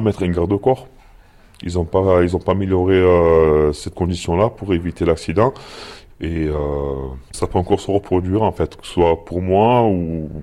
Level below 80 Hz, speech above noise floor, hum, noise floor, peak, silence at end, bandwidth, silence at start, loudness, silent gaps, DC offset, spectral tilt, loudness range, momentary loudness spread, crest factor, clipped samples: -34 dBFS; 29 dB; none; -46 dBFS; -2 dBFS; 0 s; 12 kHz; 0 s; -18 LUFS; none; under 0.1%; -7.5 dB/octave; 5 LU; 12 LU; 16 dB; under 0.1%